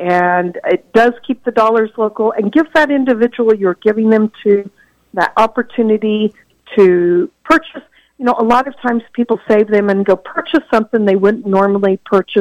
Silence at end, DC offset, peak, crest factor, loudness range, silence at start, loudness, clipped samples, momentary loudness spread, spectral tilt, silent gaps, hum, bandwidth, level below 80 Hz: 0 s; under 0.1%; -2 dBFS; 12 dB; 1 LU; 0 s; -13 LUFS; under 0.1%; 6 LU; -7 dB/octave; none; none; 10.5 kHz; -52 dBFS